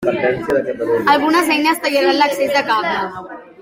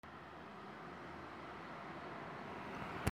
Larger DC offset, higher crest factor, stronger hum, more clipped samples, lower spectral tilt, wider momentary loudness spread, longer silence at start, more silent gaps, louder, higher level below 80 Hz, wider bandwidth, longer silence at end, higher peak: neither; second, 14 dB vs 30 dB; neither; neither; second, -4 dB/octave vs -5.5 dB/octave; about the same, 8 LU vs 6 LU; about the same, 0 s vs 0.05 s; neither; first, -15 LUFS vs -49 LUFS; first, -54 dBFS vs -62 dBFS; about the same, 16.5 kHz vs 16 kHz; about the same, 0 s vs 0.05 s; first, -2 dBFS vs -18 dBFS